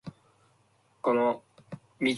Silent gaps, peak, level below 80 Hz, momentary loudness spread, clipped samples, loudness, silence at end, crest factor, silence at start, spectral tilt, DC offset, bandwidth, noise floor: none; -14 dBFS; -72 dBFS; 21 LU; under 0.1%; -29 LUFS; 0 s; 18 dB; 0.05 s; -5.5 dB/octave; under 0.1%; 11.5 kHz; -67 dBFS